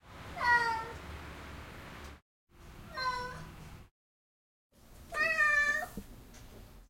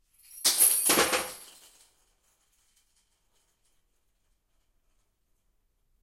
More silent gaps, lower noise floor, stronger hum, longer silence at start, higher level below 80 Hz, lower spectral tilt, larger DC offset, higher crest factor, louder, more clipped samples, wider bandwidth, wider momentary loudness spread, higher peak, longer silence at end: first, 2.22-2.47 s, 3.91-4.70 s vs none; first, under -90 dBFS vs -73 dBFS; neither; second, 0.05 s vs 0.35 s; first, -56 dBFS vs -68 dBFS; first, -3 dB/octave vs 0 dB/octave; neither; about the same, 20 dB vs 24 dB; second, -31 LUFS vs -23 LUFS; neither; about the same, 16.5 kHz vs 16.5 kHz; first, 26 LU vs 17 LU; second, -16 dBFS vs -8 dBFS; second, 0.05 s vs 4.6 s